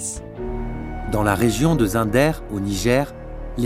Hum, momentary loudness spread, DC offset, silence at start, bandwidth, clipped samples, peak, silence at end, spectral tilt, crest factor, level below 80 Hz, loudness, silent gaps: none; 12 LU; under 0.1%; 0 s; 16 kHz; under 0.1%; -2 dBFS; 0 s; -5.5 dB/octave; 20 dB; -32 dBFS; -21 LUFS; none